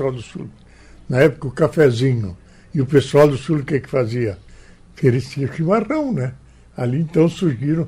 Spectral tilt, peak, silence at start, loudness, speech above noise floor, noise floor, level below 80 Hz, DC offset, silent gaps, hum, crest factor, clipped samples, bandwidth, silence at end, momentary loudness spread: -7.5 dB/octave; -2 dBFS; 0 s; -18 LUFS; 26 dB; -43 dBFS; -46 dBFS; under 0.1%; none; none; 16 dB; under 0.1%; 15 kHz; 0 s; 14 LU